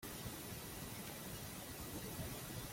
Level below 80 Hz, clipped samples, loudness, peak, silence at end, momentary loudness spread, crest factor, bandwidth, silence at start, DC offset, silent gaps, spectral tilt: -60 dBFS; under 0.1%; -48 LUFS; -34 dBFS; 0 s; 2 LU; 14 dB; 16.5 kHz; 0 s; under 0.1%; none; -3.5 dB/octave